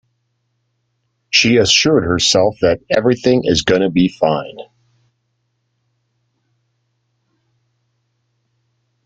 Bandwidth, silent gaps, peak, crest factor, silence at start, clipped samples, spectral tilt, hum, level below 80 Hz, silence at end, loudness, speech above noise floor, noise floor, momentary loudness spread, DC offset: 9.4 kHz; none; 0 dBFS; 18 dB; 1.3 s; under 0.1%; -4 dB/octave; none; -48 dBFS; 4.4 s; -14 LUFS; 54 dB; -68 dBFS; 7 LU; under 0.1%